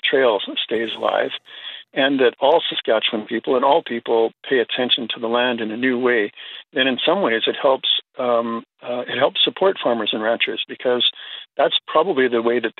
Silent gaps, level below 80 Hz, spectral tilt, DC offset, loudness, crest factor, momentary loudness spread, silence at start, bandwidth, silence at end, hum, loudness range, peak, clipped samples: none; -76 dBFS; -6.5 dB/octave; under 0.1%; -19 LUFS; 18 dB; 10 LU; 0.05 s; 4.5 kHz; 0.1 s; none; 1 LU; -2 dBFS; under 0.1%